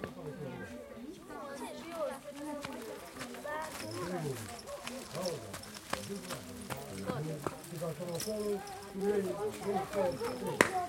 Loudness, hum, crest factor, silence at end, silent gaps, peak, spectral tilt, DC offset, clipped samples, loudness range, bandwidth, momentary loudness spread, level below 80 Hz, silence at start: -39 LUFS; none; 34 dB; 0 s; none; -4 dBFS; -4.5 dB/octave; under 0.1%; under 0.1%; 6 LU; 17 kHz; 10 LU; -64 dBFS; 0 s